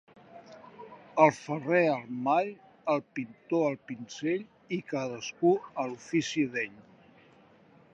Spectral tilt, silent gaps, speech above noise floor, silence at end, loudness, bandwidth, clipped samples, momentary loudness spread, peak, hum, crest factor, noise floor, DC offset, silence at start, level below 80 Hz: -5.5 dB/octave; none; 30 dB; 1.1 s; -30 LUFS; 8 kHz; under 0.1%; 16 LU; -8 dBFS; none; 24 dB; -59 dBFS; under 0.1%; 0.35 s; -78 dBFS